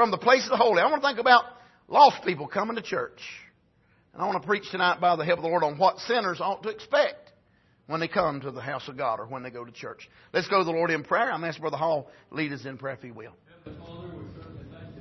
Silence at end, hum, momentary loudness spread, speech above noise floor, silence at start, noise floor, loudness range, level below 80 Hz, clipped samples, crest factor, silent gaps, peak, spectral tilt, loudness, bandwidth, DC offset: 0 s; none; 22 LU; 38 dB; 0 s; -64 dBFS; 9 LU; -64 dBFS; under 0.1%; 22 dB; none; -4 dBFS; -5 dB/octave; -25 LUFS; 6.2 kHz; under 0.1%